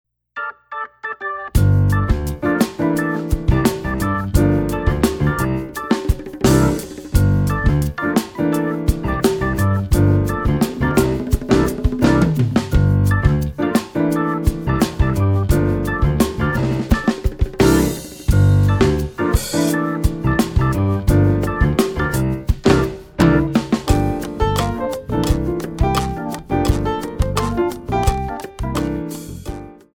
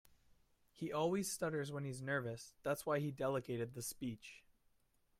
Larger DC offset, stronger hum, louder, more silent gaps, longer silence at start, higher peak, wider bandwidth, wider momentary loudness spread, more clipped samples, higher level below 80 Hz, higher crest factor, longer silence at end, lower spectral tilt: neither; neither; first, -18 LUFS vs -42 LUFS; neither; second, 0.35 s vs 0.75 s; first, 0 dBFS vs -26 dBFS; first, 18.5 kHz vs 16 kHz; about the same, 9 LU vs 9 LU; neither; first, -24 dBFS vs -74 dBFS; about the same, 16 dB vs 16 dB; second, 0.2 s vs 0.8 s; first, -6.5 dB/octave vs -5 dB/octave